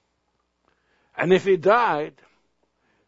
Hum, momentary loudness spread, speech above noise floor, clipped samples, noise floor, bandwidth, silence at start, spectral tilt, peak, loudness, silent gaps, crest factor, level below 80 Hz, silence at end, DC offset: none; 16 LU; 52 dB; under 0.1%; -72 dBFS; 7.8 kHz; 1.2 s; -6.5 dB/octave; -4 dBFS; -20 LUFS; none; 20 dB; -68 dBFS; 0.95 s; under 0.1%